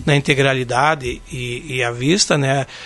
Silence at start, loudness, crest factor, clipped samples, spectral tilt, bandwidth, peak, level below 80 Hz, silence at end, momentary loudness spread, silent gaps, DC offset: 0 s; -17 LUFS; 18 dB; under 0.1%; -4 dB/octave; 11.5 kHz; 0 dBFS; -42 dBFS; 0 s; 11 LU; none; under 0.1%